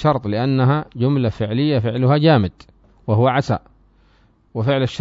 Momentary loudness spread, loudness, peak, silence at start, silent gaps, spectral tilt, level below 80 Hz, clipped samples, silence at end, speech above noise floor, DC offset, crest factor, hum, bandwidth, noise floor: 9 LU; -18 LUFS; -2 dBFS; 0 s; none; -8 dB/octave; -48 dBFS; under 0.1%; 0 s; 38 dB; under 0.1%; 16 dB; none; 7.6 kHz; -55 dBFS